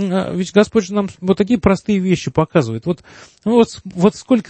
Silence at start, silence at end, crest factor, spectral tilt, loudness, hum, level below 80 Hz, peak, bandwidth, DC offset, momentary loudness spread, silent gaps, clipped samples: 0 s; 0.1 s; 16 dB; -6.5 dB/octave; -17 LUFS; none; -44 dBFS; 0 dBFS; 8.8 kHz; under 0.1%; 7 LU; none; under 0.1%